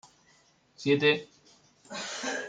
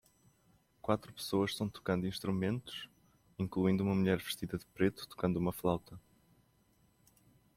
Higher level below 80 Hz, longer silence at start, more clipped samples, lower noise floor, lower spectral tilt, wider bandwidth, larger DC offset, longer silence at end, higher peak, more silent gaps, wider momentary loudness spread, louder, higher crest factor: second, -74 dBFS vs -64 dBFS; about the same, 0.8 s vs 0.85 s; neither; second, -64 dBFS vs -71 dBFS; second, -4 dB/octave vs -6.5 dB/octave; second, 9.4 kHz vs 16 kHz; neither; second, 0 s vs 1.6 s; first, -10 dBFS vs -16 dBFS; neither; about the same, 14 LU vs 12 LU; first, -28 LUFS vs -36 LUFS; about the same, 22 dB vs 20 dB